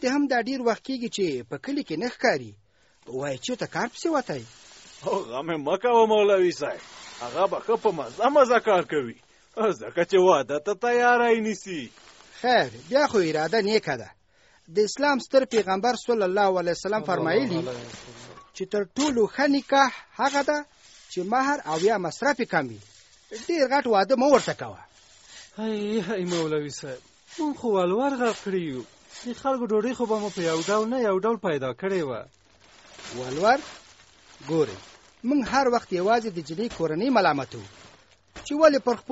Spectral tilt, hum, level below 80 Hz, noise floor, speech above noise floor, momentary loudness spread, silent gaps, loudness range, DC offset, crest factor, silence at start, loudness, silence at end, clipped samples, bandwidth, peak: -3.5 dB/octave; none; -62 dBFS; -61 dBFS; 37 dB; 17 LU; none; 6 LU; under 0.1%; 20 dB; 0 s; -24 LUFS; 0 s; under 0.1%; 8 kHz; -6 dBFS